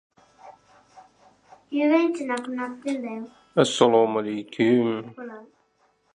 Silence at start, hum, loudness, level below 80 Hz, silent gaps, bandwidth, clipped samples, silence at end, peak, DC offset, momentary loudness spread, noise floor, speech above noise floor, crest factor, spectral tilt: 0.45 s; none; -23 LUFS; -74 dBFS; none; 11 kHz; under 0.1%; 0.7 s; -2 dBFS; under 0.1%; 19 LU; -66 dBFS; 43 dB; 22 dB; -5 dB/octave